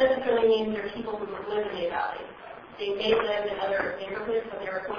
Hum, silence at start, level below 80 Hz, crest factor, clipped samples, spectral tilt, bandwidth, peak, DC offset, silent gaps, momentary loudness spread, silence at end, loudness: none; 0 s; -58 dBFS; 18 dB; under 0.1%; -6 dB/octave; 5.2 kHz; -10 dBFS; under 0.1%; none; 11 LU; 0 s; -28 LUFS